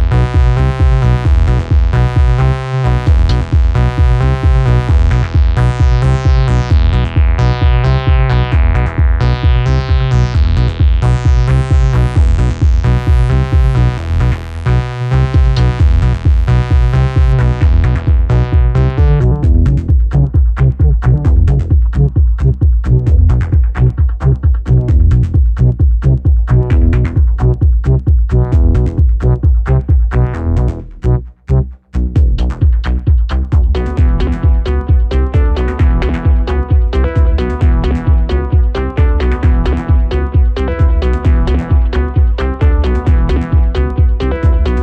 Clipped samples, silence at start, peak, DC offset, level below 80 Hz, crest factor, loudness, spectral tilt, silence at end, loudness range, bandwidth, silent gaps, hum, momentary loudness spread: under 0.1%; 0 s; 0 dBFS; under 0.1%; -12 dBFS; 10 dB; -12 LUFS; -8.5 dB/octave; 0 s; 2 LU; 6.6 kHz; none; none; 3 LU